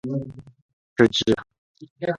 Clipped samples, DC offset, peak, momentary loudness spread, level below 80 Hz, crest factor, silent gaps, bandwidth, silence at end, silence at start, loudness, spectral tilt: under 0.1%; under 0.1%; -2 dBFS; 15 LU; -56 dBFS; 24 dB; 0.62-0.96 s, 1.58-1.75 s, 1.90-1.96 s; 11 kHz; 0 s; 0.05 s; -22 LUFS; -5 dB/octave